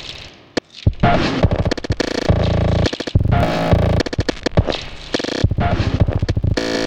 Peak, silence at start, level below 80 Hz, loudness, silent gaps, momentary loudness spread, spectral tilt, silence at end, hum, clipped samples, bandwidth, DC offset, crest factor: 0 dBFS; 0 s; -26 dBFS; -18 LUFS; none; 8 LU; -6.5 dB/octave; 0 s; none; under 0.1%; 9.8 kHz; under 0.1%; 16 dB